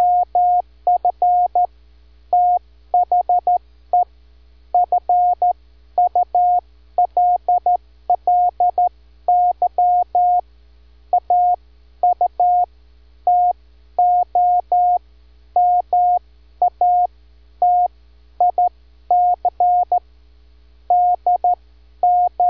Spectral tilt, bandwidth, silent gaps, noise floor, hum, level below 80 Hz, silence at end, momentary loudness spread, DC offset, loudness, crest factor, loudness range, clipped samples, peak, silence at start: -8.5 dB/octave; 1.5 kHz; none; -49 dBFS; none; -48 dBFS; 0 s; 6 LU; 0.2%; -18 LUFS; 10 dB; 2 LU; under 0.1%; -8 dBFS; 0 s